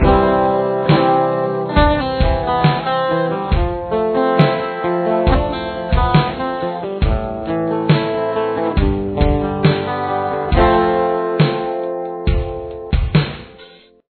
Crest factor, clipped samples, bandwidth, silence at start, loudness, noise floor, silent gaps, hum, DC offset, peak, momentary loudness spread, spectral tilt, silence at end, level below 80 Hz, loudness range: 16 dB; under 0.1%; 4.6 kHz; 0 s; -17 LUFS; -43 dBFS; none; none; under 0.1%; 0 dBFS; 8 LU; -10.5 dB/octave; 0.45 s; -24 dBFS; 2 LU